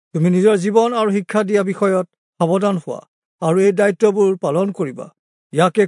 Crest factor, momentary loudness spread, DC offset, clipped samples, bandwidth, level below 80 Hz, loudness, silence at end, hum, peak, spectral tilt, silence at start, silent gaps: 16 dB; 11 LU; under 0.1%; under 0.1%; 11 kHz; -72 dBFS; -17 LUFS; 0 s; none; -2 dBFS; -6.5 dB/octave; 0.15 s; 2.18-2.33 s, 3.08-3.39 s, 5.19-5.50 s